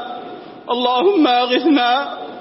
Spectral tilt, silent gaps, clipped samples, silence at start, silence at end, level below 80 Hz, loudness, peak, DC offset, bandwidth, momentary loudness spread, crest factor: -7 dB/octave; none; under 0.1%; 0 s; 0 s; -70 dBFS; -15 LUFS; -4 dBFS; under 0.1%; 5.8 kHz; 17 LU; 14 dB